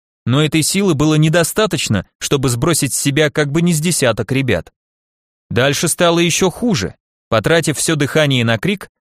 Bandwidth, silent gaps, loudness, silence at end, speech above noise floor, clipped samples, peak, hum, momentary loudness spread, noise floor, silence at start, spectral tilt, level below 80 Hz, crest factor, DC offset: 15.5 kHz; 2.15-2.19 s, 4.76-5.50 s, 7.00-7.31 s; -15 LUFS; 0.2 s; over 75 dB; under 0.1%; 0 dBFS; none; 6 LU; under -90 dBFS; 0.25 s; -4.5 dB/octave; -42 dBFS; 14 dB; under 0.1%